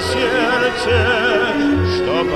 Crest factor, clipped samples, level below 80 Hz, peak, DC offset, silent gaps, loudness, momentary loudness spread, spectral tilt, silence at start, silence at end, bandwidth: 12 dB; under 0.1%; -36 dBFS; -4 dBFS; under 0.1%; none; -16 LUFS; 2 LU; -5.5 dB/octave; 0 s; 0 s; 14 kHz